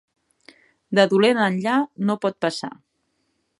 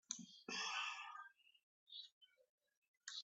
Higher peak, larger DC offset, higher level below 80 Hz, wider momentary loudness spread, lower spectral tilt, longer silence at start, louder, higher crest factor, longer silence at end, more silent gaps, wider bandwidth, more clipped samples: first, -2 dBFS vs -26 dBFS; neither; first, -74 dBFS vs under -90 dBFS; second, 9 LU vs 15 LU; first, -5.5 dB/octave vs 0 dB/octave; first, 0.9 s vs 0.1 s; first, -21 LUFS vs -49 LUFS; about the same, 22 dB vs 26 dB; first, 0.9 s vs 0 s; second, none vs 1.63-1.86 s, 2.12-2.21 s, 2.49-2.58 s, 2.77-2.82 s, 2.88-2.94 s; first, 11.5 kHz vs 8.2 kHz; neither